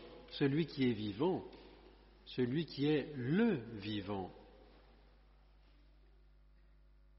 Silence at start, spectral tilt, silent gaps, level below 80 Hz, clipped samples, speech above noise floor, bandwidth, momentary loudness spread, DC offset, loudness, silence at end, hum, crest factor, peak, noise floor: 0 s; -6 dB/octave; none; -64 dBFS; under 0.1%; 28 dB; 5.8 kHz; 16 LU; under 0.1%; -37 LUFS; 2.55 s; 50 Hz at -65 dBFS; 18 dB; -22 dBFS; -64 dBFS